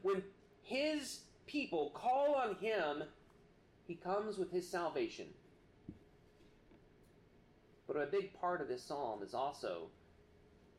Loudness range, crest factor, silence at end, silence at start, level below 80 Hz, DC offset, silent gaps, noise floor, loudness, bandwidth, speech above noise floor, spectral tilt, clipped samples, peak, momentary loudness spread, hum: 8 LU; 16 dB; 0.9 s; 0.05 s; -74 dBFS; under 0.1%; none; -67 dBFS; -40 LUFS; 15 kHz; 27 dB; -4.5 dB/octave; under 0.1%; -26 dBFS; 20 LU; none